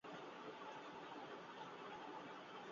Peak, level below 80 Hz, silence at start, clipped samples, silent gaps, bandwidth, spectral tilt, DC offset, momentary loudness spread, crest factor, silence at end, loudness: -40 dBFS; under -90 dBFS; 0.05 s; under 0.1%; none; 7.4 kHz; -2.5 dB/octave; under 0.1%; 1 LU; 14 dB; 0 s; -54 LUFS